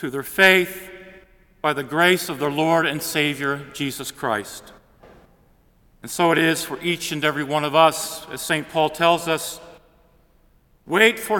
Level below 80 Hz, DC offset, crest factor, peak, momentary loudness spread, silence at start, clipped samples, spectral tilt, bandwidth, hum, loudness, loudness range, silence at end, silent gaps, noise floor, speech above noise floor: -58 dBFS; under 0.1%; 22 dB; 0 dBFS; 13 LU; 0 s; under 0.1%; -3.5 dB/octave; 18 kHz; none; -20 LUFS; 5 LU; 0 s; none; -57 dBFS; 37 dB